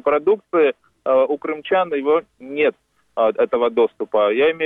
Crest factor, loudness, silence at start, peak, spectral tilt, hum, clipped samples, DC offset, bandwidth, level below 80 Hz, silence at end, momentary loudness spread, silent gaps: 12 dB; -19 LUFS; 0.05 s; -8 dBFS; -7 dB/octave; none; under 0.1%; under 0.1%; 3.9 kHz; -62 dBFS; 0 s; 4 LU; none